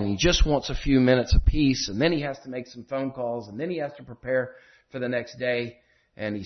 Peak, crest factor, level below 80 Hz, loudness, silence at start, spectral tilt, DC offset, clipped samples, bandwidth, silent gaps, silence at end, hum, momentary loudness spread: -8 dBFS; 18 dB; -32 dBFS; -26 LUFS; 0 s; -5 dB/octave; under 0.1%; under 0.1%; 6.4 kHz; none; 0 s; none; 15 LU